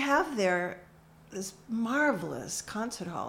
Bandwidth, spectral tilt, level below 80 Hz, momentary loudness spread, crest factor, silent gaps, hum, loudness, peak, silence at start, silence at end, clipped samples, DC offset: 16.5 kHz; -4 dB/octave; -64 dBFS; 12 LU; 18 dB; none; none; -31 LUFS; -14 dBFS; 0 s; 0 s; under 0.1%; under 0.1%